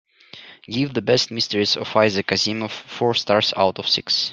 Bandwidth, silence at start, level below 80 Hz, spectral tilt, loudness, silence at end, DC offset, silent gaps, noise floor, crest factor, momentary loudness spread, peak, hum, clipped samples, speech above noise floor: 12 kHz; 0.35 s; -62 dBFS; -4 dB/octave; -20 LUFS; 0 s; under 0.1%; none; -44 dBFS; 20 dB; 8 LU; -2 dBFS; none; under 0.1%; 23 dB